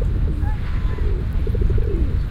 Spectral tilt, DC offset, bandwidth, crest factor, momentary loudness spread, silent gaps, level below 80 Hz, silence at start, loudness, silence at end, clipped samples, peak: -9 dB/octave; under 0.1%; 5 kHz; 12 dB; 3 LU; none; -20 dBFS; 0 s; -23 LUFS; 0 s; under 0.1%; -8 dBFS